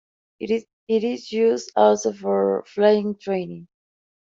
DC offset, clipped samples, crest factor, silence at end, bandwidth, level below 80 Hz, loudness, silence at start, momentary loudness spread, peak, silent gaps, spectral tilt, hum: under 0.1%; under 0.1%; 20 dB; 0.7 s; 7.8 kHz; -68 dBFS; -22 LUFS; 0.4 s; 9 LU; -4 dBFS; 0.73-0.87 s; -5.5 dB/octave; none